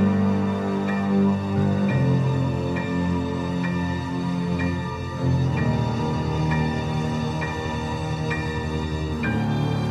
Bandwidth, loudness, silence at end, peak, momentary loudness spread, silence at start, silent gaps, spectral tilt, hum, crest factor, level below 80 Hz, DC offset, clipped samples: 10.5 kHz; -24 LUFS; 0 s; -8 dBFS; 6 LU; 0 s; none; -7.5 dB/octave; none; 14 dB; -40 dBFS; under 0.1%; under 0.1%